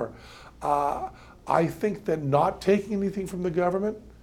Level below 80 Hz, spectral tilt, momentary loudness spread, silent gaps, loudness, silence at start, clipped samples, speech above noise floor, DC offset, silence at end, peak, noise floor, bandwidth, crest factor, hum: -52 dBFS; -7 dB/octave; 13 LU; none; -27 LUFS; 0 s; under 0.1%; 21 dB; under 0.1%; 0.15 s; -6 dBFS; -47 dBFS; 16.5 kHz; 20 dB; none